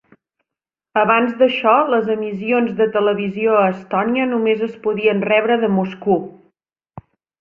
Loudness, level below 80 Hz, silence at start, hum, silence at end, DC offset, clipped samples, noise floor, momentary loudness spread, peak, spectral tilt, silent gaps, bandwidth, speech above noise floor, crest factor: -17 LUFS; -60 dBFS; 0.95 s; none; 0.4 s; under 0.1%; under 0.1%; -87 dBFS; 6 LU; -2 dBFS; -8.5 dB/octave; none; 5.2 kHz; 70 dB; 16 dB